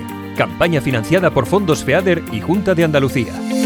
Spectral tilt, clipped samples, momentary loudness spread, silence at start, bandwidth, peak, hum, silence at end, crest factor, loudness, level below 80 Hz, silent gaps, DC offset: -6 dB/octave; under 0.1%; 6 LU; 0 s; over 20 kHz; 0 dBFS; none; 0 s; 16 dB; -16 LUFS; -44 dBFS; none; under 0.1%